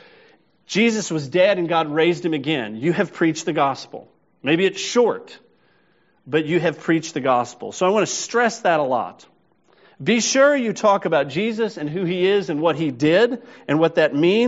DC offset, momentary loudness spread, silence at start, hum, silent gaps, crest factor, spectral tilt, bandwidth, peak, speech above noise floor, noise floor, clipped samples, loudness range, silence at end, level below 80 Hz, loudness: under 0.1%; 8 LU; 0.7 s; none; none; 16 dB; -4 dB/octave; 8 kHz; -4 dBFS; 42 dB; -61 dBFS; under 0.1%; 3 LU; 0 s; -68 dBFS; -20 LUFS